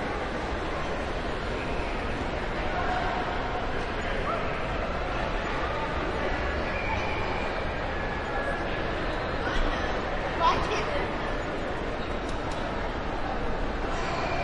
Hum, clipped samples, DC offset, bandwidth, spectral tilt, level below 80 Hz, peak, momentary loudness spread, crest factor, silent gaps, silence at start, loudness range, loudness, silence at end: none; under 0.1%; under 0.1%; 10.5 kHz; -5.5 dB/octave; -36 dBFS; -10 dBFS; 3 LU; 18 dB; none; 0 s; 2 LU; -30 LUFS; 0 s